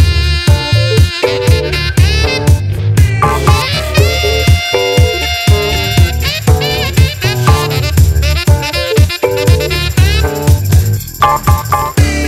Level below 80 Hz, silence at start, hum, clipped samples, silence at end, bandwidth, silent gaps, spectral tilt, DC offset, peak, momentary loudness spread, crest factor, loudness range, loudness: -16 dBFS; 0 s; none; 0.1%; 0 s; 16 kHz; none; -5 dB/octave; under 0.1%; 0 dBFS; 2 LU; 10 dB; 1 LU; -11 LUFS